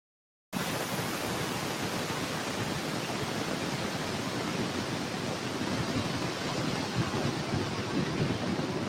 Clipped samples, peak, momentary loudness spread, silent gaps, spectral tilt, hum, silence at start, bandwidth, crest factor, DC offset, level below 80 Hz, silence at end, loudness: under 0.1%; -18 dBFS; 2 LU; none; -4.5 dB/octave; none; 0.5 s; 16.5 kHz; 14 dB; under 0.1%; -58 dBFS; 0 s; -32 LUFS